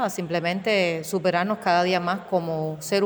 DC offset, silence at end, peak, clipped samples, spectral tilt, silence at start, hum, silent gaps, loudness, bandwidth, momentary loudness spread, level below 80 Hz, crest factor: under 0.1%; 0 s; -8 dBFS; under 0.1%; -5 dB/octave; 0 s; none; none; -24 LUFS; over 20 kHz; 5 LU; -66 dBFS; 16 dB